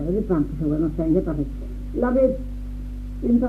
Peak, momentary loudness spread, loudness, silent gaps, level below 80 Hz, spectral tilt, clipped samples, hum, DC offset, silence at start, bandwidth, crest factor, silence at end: -6 dBFS; 14 LU; -23 LUFS; none; -32 dBFS; -10.5 dB/octave; under 0.1%; 50 Hz at -30 dBFS; under 0.1%; 0 s; 5.6 kHz; 16 dB; 0 s